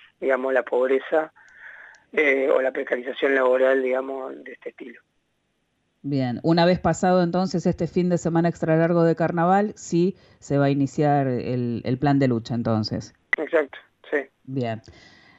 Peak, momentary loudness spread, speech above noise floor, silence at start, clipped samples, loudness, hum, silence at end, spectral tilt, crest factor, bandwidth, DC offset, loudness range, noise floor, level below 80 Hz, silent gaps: -6 dBFS; 14 LU; 49 dB; 0.2 s; under 0.1%; -22 LUFS; none; 0.5 s; -7 dB/octave; 16 dB; 8 kHz; under 0.1%; 4 LU; -72 dBFS; -56 dBFS; none